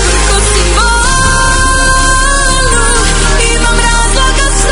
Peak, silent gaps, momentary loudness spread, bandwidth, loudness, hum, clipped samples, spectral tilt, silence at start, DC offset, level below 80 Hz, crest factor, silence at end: 0 dBFS; none; 1 LU; 11 kHz; -8 LUFS; none; 0.5%; -2.5 dB/octave; 0 s; under 0.1%; -12 dBFS; 8 dB; 0 s